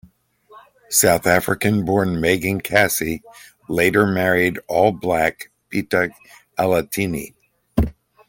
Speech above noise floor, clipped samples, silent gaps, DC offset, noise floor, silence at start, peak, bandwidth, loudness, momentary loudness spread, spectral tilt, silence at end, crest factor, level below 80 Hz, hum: 34 dB; under 0.1%; none; under 0.1%; -52 dBFS; 0.55 s; 0 dBFS; 17 kHz; -19 LUFS; 11 LU; -4.5 dB/octave; 0.35 s; 20 dB; -40 dBFS; none